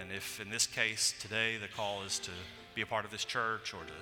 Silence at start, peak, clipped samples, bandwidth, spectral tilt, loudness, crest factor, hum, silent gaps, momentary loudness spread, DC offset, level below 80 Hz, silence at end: 0 s; -16 dBFS; under 0.1%; 17.5 kHz; -1 dB/octave; -35 LUFS; 22 dB; none; none; 11 LU; under 0.1%; -68 dBFS; 0 s